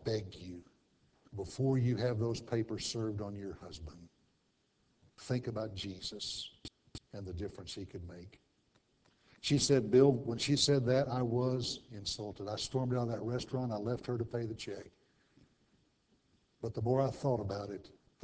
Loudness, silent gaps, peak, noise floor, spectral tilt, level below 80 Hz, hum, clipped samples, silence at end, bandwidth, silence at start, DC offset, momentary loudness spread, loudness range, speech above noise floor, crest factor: -35 LUFS; none; -14 dBFS; -76 dBFS; -5.5 dB/octave; -60 dBFS; none; under 0.1%; 0.35 s; 8 kHz; 0 s; under 0.1%; 20 LU; 12 LU; 41 dB; 22 dB